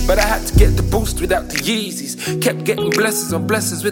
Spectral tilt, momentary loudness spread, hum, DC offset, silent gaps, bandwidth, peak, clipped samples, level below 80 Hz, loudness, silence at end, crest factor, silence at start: -4.5 dB/octave; 5 LU; none; under 0.1%; none; 17 kHz; 0 dBFS; under 0.1%; -22 dBFS; -17 LUFS; 0 s; 16 dB; 0 s